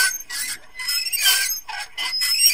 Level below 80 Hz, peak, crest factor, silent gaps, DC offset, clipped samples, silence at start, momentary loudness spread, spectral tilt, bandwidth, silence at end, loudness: -58 dBFS; -2 dBFS; 20 dB; none; 0.7%; under 0.1%; 0 s; 11 LU; 4.5 dB/octave; 16 kHz; 0 s; -20 LUFS